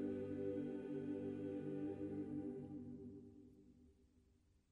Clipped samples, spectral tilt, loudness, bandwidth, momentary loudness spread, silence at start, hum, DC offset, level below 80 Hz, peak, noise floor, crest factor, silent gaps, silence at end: under 0.1%; -9.5 dB/octave; -48 LUFS; 4.3 kHz; 16 LU; 0 s; none; under 0.1%; -76 dBFS; -34 dBFS; -75 dBFS; 14 dB; none; 0.55 s